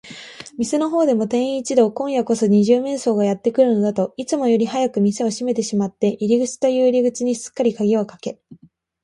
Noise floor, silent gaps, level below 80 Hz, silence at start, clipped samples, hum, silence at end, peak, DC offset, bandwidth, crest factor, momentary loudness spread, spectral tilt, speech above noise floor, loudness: -38 dBFS; none; -64 dBFS; 0.05 s; under 0.1%; none; 0.5 s; -2 dBFS; under 0.1%; 11.5 kHz; 16 dB; 7 LU; -6 dB/octave; 20 dB; -19 LUFS